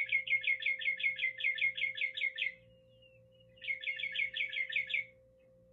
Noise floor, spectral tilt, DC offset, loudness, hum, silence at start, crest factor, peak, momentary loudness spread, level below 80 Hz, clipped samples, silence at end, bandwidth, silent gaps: -64 dBFS; -1.5 dB/octave; under 0.1%; -33 LUFS; none; 0 s; 16 dB; -22 dBFS; 7 LU; -78 dBFS; under 0.1%; 0.6 s; 7.6 kHz; none